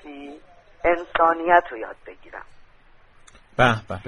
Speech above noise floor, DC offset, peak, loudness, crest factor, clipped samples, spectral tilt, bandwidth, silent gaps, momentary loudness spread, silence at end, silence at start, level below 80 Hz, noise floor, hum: 30 dB; under 0.1%; -2 dBFS; -20 LUFS; 22 dB; under 0.1%; -6 dB/octave; 10 kHz; none; 23 LU; 0 s; 0.05 s; -48 dBFS; -52 dBFS; none